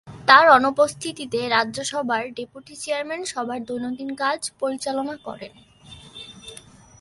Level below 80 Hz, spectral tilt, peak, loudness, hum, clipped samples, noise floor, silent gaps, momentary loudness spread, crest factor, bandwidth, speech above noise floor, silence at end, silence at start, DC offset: -60 dBFS; -2.5 dB/octave; 0 dBFS; -21 LUFS; none; under 0.1%; -46 dBFS; none; 24 LU; 22 dB; 11.5 kHz; 24 dB; 0.45 s; 0.05 s; under 0.1%